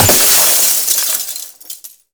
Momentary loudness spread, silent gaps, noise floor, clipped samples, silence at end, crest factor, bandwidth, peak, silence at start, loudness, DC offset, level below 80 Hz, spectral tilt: 23 LU; none; -33 dBFS; under 0.1%; 0.25 s; 14 dB; over 20 kHz; 0 dBFS; 0 s; -8 LUFS; under 0.1%; -46 dBFS; -1 dB/octave